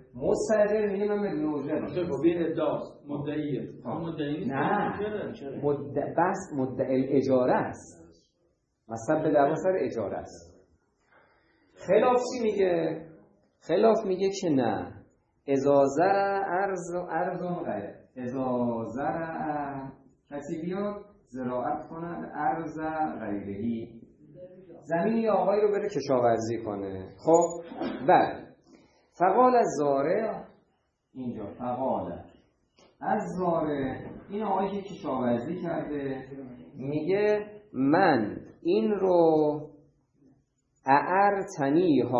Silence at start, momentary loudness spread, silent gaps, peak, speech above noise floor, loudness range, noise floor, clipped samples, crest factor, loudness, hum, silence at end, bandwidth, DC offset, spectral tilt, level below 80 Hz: 0.15 s; 14 LU; none; -6 dBFS; 46 dB; 7 LU; -73 dBFS; under 0.1%; 22 dB; -28 LUFS; none; 0 s; 9 kHz; under 0.1%; -6.5 dB/octave; -64 dBFS